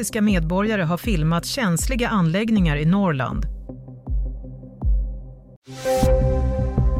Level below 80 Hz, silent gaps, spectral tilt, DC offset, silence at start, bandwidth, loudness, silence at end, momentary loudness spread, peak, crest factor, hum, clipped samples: -26 dBFS; 5.56-5.62 s; -6 dB/octave; under 0.1%; 0 s; 16 kHz; -21 LUFS; 0 s; 17 LU; -6 dBFS; 14 dB; none; under 0.1%